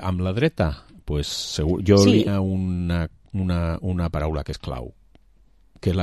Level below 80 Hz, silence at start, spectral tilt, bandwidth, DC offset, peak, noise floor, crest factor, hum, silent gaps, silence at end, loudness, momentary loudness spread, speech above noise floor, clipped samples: -34 dBFS; 0 s; -6.5 dB/octave; 13 kHz; 0.1%; -2 dBFS; -57 dBFS; 20 dB; none; none; 0 s; -23 LUFS; 15 LU; 35 dB; under 0.1%